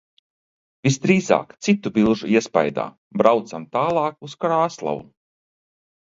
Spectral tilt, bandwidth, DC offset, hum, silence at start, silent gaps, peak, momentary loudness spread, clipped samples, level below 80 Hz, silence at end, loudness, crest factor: -6 dB/octave; 7.8 kHz; under 0.1%; none; 0.85 s; 2.98-3.11 s; 0 dBFS; 10 LU; under 0.1%; -60 dBFS; 1 s; -21 LUFS; 22 dB